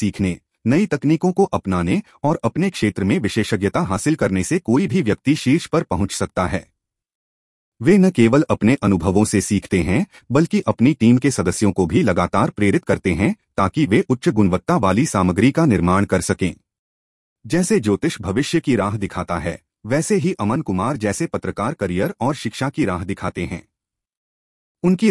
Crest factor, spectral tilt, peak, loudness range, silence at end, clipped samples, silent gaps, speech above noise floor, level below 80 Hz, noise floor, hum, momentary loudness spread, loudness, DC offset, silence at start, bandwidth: 16 dB; -6 dB/octave; -2 dBFS; 5 LU; 0 s; under 0.1%; 7.15-7.72 s, 16.79-17.36 s, 24.17-24.75 s; 64 dB; -46 dBFS; -81 dBFS; none; 8 LU; -19 LUFS; under 0.1%; 0 s; 12 kHz